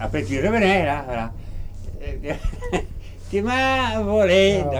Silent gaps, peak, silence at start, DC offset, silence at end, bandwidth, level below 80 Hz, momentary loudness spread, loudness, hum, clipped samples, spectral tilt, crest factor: none; -6 dBFS; 0 s; under 0.1%; 0 s; 19.5 kHz; -32 dBFS; 20 LU; -21 LUFS; none; under 0.1%; -5.5 dB/octave; 16 dB